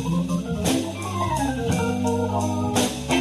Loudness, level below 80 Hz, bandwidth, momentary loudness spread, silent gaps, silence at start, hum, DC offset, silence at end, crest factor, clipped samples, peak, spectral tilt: -24 LUFS; -42 dBFS; 13 kHz; 3 LU; none; 0 s; none; under 0.1%; 0 s; 16 dB; under 0.1%; -8 dBFS; -5 dB/octave